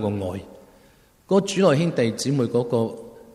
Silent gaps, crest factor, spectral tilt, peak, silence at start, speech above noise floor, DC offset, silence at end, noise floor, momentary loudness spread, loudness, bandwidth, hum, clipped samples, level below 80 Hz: none; 18 dB; -6 dB/octave; -6 dBFS; 0 s; 34 dB; under 0.1%; 0.15 s; -55 dBFS; 12 LU; -22 LUFS; 13.5 kHz; none; under 0.1%; -60 dBFS